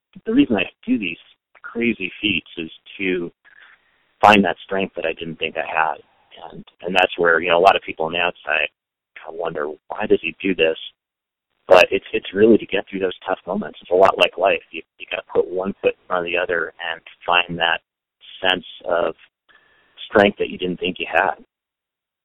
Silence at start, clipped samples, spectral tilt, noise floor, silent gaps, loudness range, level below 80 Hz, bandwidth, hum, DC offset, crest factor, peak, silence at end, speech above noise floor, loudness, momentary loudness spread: 0.15 s; under 0.1%; -5.5 dB/octave; -86 dBFS; none; 4 LU; -54 dBFS; 13.5 kHz; none; under 0.1%; 20 dB; 0 dBFS; 0.9 s; 66 dB; -19 LUFS; 16 LU